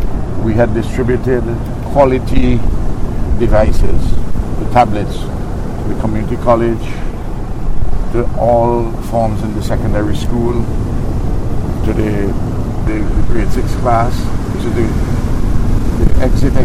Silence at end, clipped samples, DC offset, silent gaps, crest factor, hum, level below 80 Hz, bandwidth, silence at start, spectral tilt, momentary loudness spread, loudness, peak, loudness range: 0 s; under 0.1%; under 0.1%; none; 12 dB; none; -16 dBFS; 12.5 kHz; 0 s; -8 dB/octave; 9 LU; -16 LUFS; 0 dBFS; 3 LU